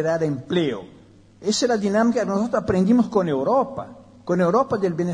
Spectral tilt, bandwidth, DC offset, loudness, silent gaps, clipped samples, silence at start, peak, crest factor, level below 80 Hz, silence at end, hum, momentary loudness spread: -6 dB/octave; 10.5 kHz; under 0.1%; -21 LUFS; none; under 0.1%; 0 s; -6 dBFS; 16 dB; -52 dBFS; 0 s; none; 11 LU